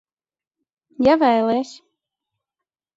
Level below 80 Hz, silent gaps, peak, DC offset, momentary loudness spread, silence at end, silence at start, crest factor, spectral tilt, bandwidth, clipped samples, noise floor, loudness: -56 dBFS; none; -4 dBFS; under 0.1%; 10 LU; 1.25 s; 1 s; 18 dB; -5.5 dB/octave; 7.8 kHz; under 0.1%; under -90 dBFS; -18 LUFS